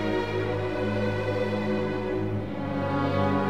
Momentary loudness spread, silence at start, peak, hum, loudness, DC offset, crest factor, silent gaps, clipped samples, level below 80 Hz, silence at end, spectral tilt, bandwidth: 4 LU; 0 s; -12 dBFS; none; -28 LUFS; 0.7%; 16 dB; none; under 0.1%; -50 dBFS; 0 s; -8 dB/octave; 9.6 kHz